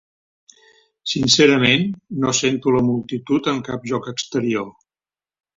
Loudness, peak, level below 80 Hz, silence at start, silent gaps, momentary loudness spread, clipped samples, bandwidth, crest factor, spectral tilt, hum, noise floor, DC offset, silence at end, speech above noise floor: -18 LUFS; 0 dBFS; -54 dBFS; 1.05 s; none; 12 LU; under 0.1%; 7.8 kHz; 20 dB; -4 dB/octave; none; under -90 dBFS; under 0.1%; 0.85 s; over 71 dB